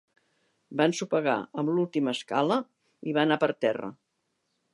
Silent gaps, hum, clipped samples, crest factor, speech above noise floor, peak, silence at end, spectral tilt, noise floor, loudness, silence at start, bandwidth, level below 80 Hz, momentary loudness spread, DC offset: none; none; under 0.1%; 20 dB; 51 dB; -8 dBFS; 0.8 s; -5.5 dB/octave; -78 dBFS; -27 LUFS; 0.7 s; 11.5 kHz; -80 dBFS; 11 LU; under 0.1%